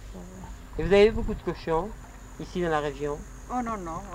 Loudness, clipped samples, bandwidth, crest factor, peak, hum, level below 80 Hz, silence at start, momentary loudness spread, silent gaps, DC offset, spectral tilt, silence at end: -27 LUFS; under 0.1%; 15 kHz; 20 dB; -8 dBFS; none; -40 dBFS; 0 s; 23 LU; none; under 0.1%; -6 dB/octave; 0 s